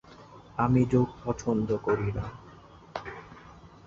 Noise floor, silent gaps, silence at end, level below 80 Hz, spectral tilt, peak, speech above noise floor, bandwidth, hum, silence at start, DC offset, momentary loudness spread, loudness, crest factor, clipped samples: -51 dBFS; none; 0.2 s; -50 dBFS; -8 dB/octave; -12 dBFS; 24 dB; 7.6 kHz; none; 0.1 s; under 0.1%; 22 LU; -28 LUFS; 18 dB; under 0.1%